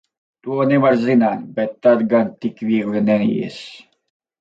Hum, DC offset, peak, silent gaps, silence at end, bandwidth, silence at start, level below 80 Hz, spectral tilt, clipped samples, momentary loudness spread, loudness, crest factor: none; under 0.1%; -2 dBFS; none; 0.65 s; 7.8 kHz; 0.45 s; -64 dBFS; -8 dB/octave; under 0.1%; 13 LU; -18 LUFS; 16 dB